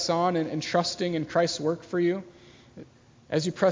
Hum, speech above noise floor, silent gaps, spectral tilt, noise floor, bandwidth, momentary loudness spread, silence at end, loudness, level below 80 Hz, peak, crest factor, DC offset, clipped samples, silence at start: none; 24 dB; none; -5 dB/octave; -50 dBFS; 7.6 kHz; 5 LU; 0 s; -27 LUFS; -64 dBFS; -8 dBFS; 20 dB; under 0.1%; under 0.1%; 0 s